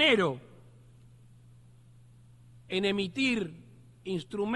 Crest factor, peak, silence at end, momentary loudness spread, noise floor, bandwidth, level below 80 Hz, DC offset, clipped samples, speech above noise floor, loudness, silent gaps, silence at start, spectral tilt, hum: 20 dB; -12 dBFS; 0 s; 16 LU; -56 dBFS; 11.5 kHz; -64 dBFS; under 0.1%; under 0.1%; 26 dB; -30 LUFS; none; 0 s; -5 dB/octave; 60 Hz at -55 dBFS